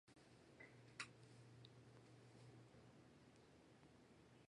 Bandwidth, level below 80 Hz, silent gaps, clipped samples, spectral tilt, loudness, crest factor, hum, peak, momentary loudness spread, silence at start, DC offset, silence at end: 11 kHz; -84 dBFS; none; under 0.1%; -4 dB/octave; -64 LUFS; 30 dB; none; -34 dBFS; 13 LU; 0.05 s; under 0.1%; 0.05 s